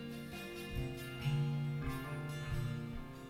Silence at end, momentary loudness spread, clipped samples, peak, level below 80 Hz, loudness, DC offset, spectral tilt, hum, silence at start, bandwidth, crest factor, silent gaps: 0 s; 9 LU; under 0.1%; -26 dBFS; -50 dBFS; -41 LUFS; under 0.1%; -6.5 dB/octave; none; 0 s; 16 kHz; 14 dB; none